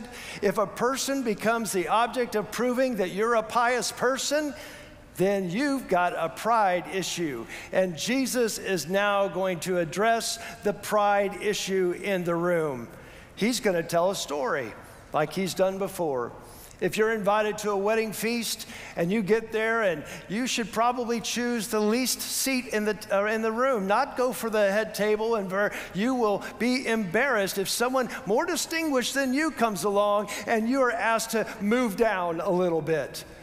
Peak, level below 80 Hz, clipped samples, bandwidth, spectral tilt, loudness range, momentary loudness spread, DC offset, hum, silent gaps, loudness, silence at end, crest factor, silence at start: -10 dBFS; -58 dBFS; under 0.1%; 16 kHz; -4 dB/octave; 2 LU; 6 LU; under 0.1%; none; none; -26 LUFS; 0 s; 16 dB; 0 s